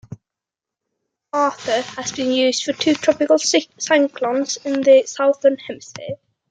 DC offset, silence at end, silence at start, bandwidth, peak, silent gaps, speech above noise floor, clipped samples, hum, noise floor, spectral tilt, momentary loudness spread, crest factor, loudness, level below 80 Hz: under 0.1%; 0.35 s; 0.1 s; 9.4 kHz; -2 dBFS; none; 68 dB; under 0.1%; none; -86 dBFS; -2.5 dB/octave; 17 LU; 16 dB; -18 LUFS; -66 dBFS